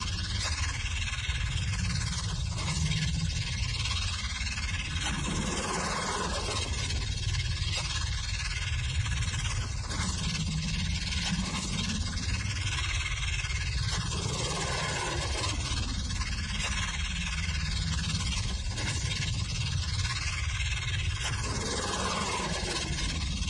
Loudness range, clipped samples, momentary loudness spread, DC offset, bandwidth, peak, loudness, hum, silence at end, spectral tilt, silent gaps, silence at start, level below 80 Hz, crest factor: 1 LU; under 0.1%; 2 LU; under 0.1%; 11.5 kHz; -16 dBFS; -31 LUFS; none; 0 s; -3.5 dB/octave; none; 0 s; -36 dBFS; 14 dB